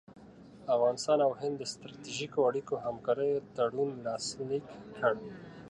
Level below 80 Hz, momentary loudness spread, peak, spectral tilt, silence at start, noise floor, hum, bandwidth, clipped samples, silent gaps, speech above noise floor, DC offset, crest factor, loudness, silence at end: -70 dBFS; 12 LU; -14 dBFS; -4.5 dB/octave; 0.1 s; -53 dBFS; none; 11.5 kHz; under 0.1%; none; 21 dB; under 0.1%; 20 dB; -32 LUFS; 0 s